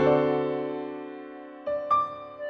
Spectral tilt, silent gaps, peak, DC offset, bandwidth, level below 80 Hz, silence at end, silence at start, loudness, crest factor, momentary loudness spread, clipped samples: -5.5 dB/octave; none; -12 dBFS; under 0.1%; 6.6 kHz; -62 dBFS; 0 s; 0 s; -28 LUFS; 16 dB; 16 LU; under 0.1%